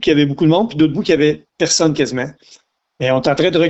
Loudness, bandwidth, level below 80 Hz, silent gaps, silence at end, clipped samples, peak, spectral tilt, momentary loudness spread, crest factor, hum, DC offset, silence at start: -15 LUFS; 8.2 kHz; -48 dBFS; none; 0 s; under 0.1%; -2 dBFS; -4.5 dB/octave; 7 LU; 14 dB; none; under 0.1%; 0 s